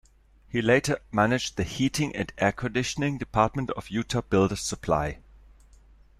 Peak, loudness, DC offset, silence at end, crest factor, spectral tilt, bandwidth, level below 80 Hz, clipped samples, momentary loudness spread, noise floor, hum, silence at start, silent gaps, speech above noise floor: -8 dBFS; -26 LUFS; under 0.1%; 1.05 s; 20 dB; -5 dB/octave; 15 kHz; -48 dBFS; under 0.1%; 8 LU; -56 dBFS; none; 0.5 s; none; 30 dB